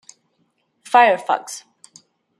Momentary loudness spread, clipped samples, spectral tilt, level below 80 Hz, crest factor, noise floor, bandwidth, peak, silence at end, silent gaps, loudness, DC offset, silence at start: 20 LU; under 0.1%; -2 dB/octave; -80 dBFS; 20 dB; -67 dBFS; 13 kHz; -2 dBFS; 0.8 s; none; -17 LUFS; under 0.1%; 0.9 s